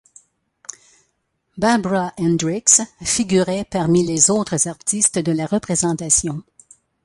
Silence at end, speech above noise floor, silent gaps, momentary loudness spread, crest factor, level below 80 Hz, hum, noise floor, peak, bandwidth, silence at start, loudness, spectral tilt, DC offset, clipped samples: 0.65 s; 51 dB; none; 12 LU; 20 dB; -50 dBFS; none; -70 dBFS; 0 dBFS; 11.5 kHz; 1.55 s; -17 LUFS; -4 dB/octave; under 0.1%; under 0.1%